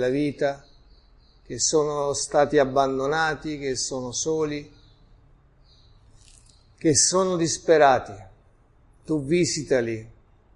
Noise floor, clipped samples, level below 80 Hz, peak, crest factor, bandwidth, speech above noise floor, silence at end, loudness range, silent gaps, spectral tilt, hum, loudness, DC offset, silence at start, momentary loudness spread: -57 dBFS; under 0.1%; -52 dBFS; -4 dBFS; 20 dB; 11.5 kHz; 34 dB; 0.45 s; 7 LU; none; -3.5 dB/octave; none; -23 LUFS; under 0.1%; 0 s; 12 LU